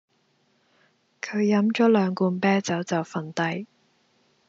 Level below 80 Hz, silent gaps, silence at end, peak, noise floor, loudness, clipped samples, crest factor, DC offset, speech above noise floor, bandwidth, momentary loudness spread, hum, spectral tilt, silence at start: -76 dBFS; none; 0.85 s; -8 dBFS; -67 dBFS; -24 LUFS; under 0.1%; 18 dB; under 0.1%; 44 dB; 7.8 kHz; 12 LU; none; -5.5 dB/octave; 1.25 s